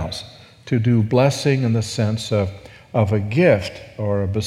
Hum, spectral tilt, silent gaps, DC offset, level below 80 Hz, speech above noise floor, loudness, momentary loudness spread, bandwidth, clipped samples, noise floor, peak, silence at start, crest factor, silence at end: none; -6.5 dB/octave; none; under 0.1%; -48 dBFS; 22 dB; -19 LUFS; 12 LU; 13 kHz; under 0.1%; -40 dBFS; -2 dBFS; 0 s; 18 dB; 0 s